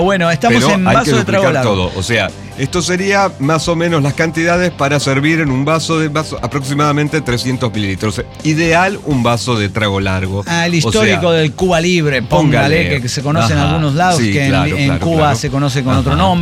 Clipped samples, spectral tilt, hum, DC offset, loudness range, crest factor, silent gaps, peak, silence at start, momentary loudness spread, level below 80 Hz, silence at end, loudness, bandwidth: under 0.1%; -5.5 dB/octave; none; under 0.1%; 2 LU; 12 dB; none; -2 dBFS; 0 s; 6 LU; -34 dBFS; 0 s; -13 LUFS; 15 kHz